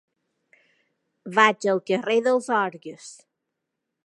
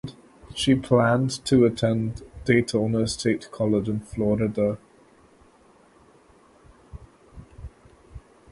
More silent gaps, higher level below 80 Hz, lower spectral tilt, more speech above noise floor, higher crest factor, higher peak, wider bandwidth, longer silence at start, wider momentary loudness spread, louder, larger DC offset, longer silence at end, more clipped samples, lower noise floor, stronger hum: neither; second, -84 dBFS vs -48 dBFS; second, -4 dB/octave vs -6 dB/octave; first, 59 dB vs 34 dB; about the same, 24 dB vs 20 dB; about the same, -2 dBFS vs -4 dBFS; about the same, 11.5 kHz vs 11.5 kHz; first, 1.25 s vs 0.05 s; first, 23 LU vs 18 LU; about the same, -22 LUFS vs -23 LUFS; neither; first, 0.95 s vs 0.35 s; neither; first, -82 dBFS vs -56 dBFS; neither